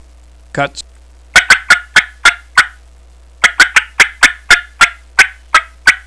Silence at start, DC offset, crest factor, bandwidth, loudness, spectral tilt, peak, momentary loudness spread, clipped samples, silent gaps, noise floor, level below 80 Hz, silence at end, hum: 0.55 s; 0.4%; 12 dB; 11 kHz; -10 LUFS; 0 dB/octave; 0 dBFS; 11 LU; 2%; none; -40 dBFS; -38 dBFS; 0.1 s; none